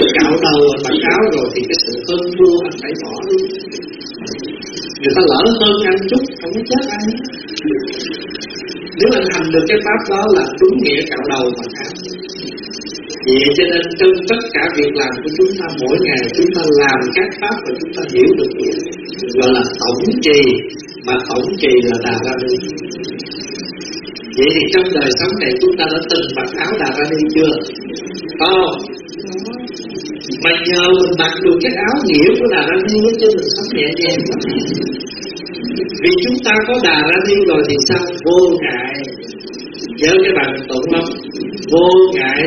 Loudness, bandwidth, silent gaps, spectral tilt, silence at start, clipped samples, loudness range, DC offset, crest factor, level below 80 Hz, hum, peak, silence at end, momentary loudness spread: -13 LUFS; 7 kHz; none; -2.5 dB/octave; 0 s; under 0.1%; 4 LU; under 0.1%; 14 dB; -46 dBFS; none; 0 dBFS; 0 s; 14 LU